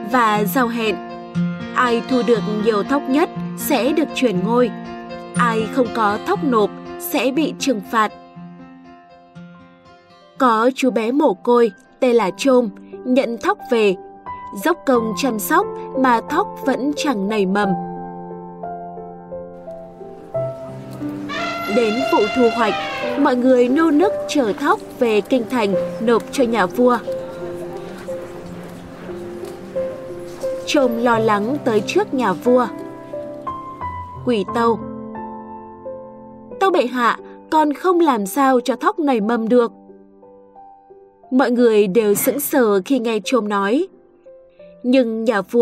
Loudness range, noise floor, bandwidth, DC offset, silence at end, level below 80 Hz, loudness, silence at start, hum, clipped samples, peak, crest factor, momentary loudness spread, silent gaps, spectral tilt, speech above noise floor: 7 LU; -47 dBFS; 16 kHz; under 0.1%; 0 s; -54 dBFS; -18 LUFS; 0 s; none; under 0.1%; -4 dBFS; 14 dB; 16 LU; none; -5 dB/octave; 30 dB